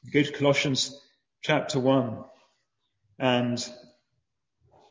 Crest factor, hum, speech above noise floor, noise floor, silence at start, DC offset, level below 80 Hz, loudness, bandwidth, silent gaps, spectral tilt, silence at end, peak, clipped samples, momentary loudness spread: 20 dB; none; 54 dB; -80 dBFS; 0.05 s; under 0.1%; -68 dBFS; -26 LUFS; 7.8 kHz; none; -4.5 dB/octave; 1.1 s; -8 dBFS; under 0.1%; 11 LU